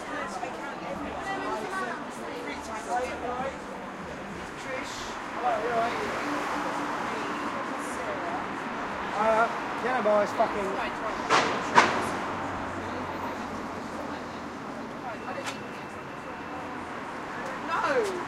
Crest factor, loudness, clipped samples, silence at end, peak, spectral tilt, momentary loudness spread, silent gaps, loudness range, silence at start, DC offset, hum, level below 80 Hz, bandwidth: 28 dB; -30 LUFS; under 0.1%; 0 s; -4 dBFS; -4 dB/octave; 13 LU; none; 10 LU; 0 s; under 0.1%; none; -58 dBFS; 16 kHz